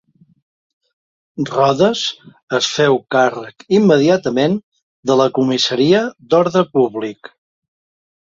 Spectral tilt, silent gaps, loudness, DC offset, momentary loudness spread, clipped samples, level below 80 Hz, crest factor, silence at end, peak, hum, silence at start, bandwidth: -5 dB/octave; 2.43-2.48 s, 4.63-4.72 s, 4.83-5.03 s; -15 LUFS; under 0.1%; 11 LU; under 0.1%; -58 dBFS; 16 dB; 1.1 s; -2 dBFS; none; 1.35 s; 7.8 kHz